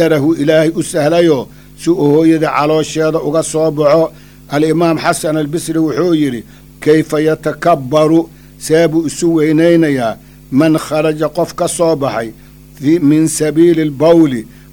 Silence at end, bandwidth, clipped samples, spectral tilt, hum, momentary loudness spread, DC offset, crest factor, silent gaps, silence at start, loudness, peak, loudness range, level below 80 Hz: 0.25 s; over 20 kHz; under 0.1%; -6 dB/octave; none; 8 LU; under 0.1%; 12 dB; none; 0 s; -12 LUFS; 0 dBFS; 2 LU; -44 dBFS